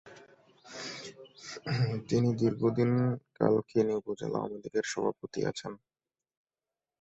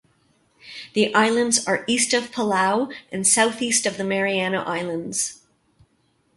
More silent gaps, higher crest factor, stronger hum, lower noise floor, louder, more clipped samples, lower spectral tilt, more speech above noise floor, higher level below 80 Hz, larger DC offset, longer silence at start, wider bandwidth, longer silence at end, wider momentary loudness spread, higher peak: neither; about the same, 20 dB vs 20 dB; neither; first, under -90 dBFS vs -65 dBFS; second, -31 LUFS vs -21 LUFS; neither; first, -6.5 dB/octave vs -2.5 dB/octave; first, over 60 dB vs 44 dB; about the same, -66 dBFS vs -66 dBFS; neither; second, 0.05 s vs 0.65 s; second, 8.2 kHz vs 12 kHz; first, 1.25 s vs 1 s; first, 17 LU vs 9 LU; second, -12 dBFS vs -2 dBFS